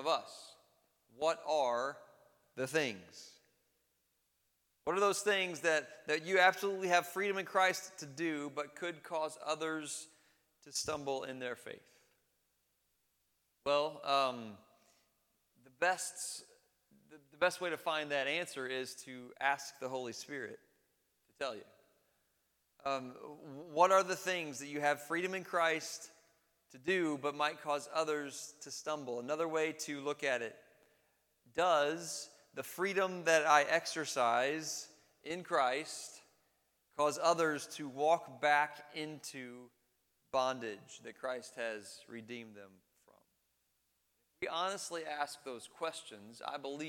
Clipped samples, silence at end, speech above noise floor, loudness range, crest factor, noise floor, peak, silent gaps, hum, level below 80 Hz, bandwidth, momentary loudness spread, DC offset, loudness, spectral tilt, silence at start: under 0.1%; 0 s; 44 dB; 10 LU; 26 dB; -80 dBFS; -12 dBFS; none; none; -82 dBFS; 19 kHz; 17 LU; under 0.1%; -36 LUFS; -2.5 dB/octave; 0 s